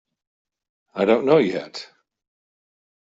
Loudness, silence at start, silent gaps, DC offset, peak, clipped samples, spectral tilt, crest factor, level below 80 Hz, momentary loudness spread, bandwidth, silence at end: -20 LUFS; 0.95 s; none; under 0.1%; -4 dBFS; under 0.1%; -6.5 dB/octave; 20 dB; -66 dBFS; 19 LU; 7.8 kHz; 1.15 s